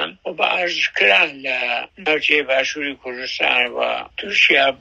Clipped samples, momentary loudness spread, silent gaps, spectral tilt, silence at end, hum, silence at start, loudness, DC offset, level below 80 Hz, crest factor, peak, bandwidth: under 0.1%; 13 LU; none; -1.5 dB/octave; 0.05 s; none; 0 s; -17 LUFS; under 0.1%; -60 dBFS; 18 dB; 0 dBFS; 10.5 kHz